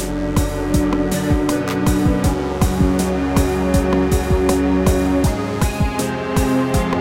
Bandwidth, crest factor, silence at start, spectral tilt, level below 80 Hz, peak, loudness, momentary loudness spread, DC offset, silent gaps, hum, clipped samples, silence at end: 17 kHz; 14 dB; 0 s; -6 dB/octave; -24 dBFS; -2 dBFS; -18 LUFS; 4 LU; under 0.1%; none; none; under 0.1%; 0 s